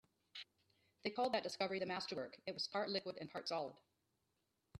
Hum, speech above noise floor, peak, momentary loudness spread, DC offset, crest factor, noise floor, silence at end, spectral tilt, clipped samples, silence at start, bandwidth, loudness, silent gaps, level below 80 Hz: none; 42 dB; -26 dBFS; 15 LU; under 0.1%; 20 dB; -86 dBFS; 0 s; -4 dB/octave; under 0.1%; 0.35 s; 13 kHz; -43 LUFS; none; -84 dBFS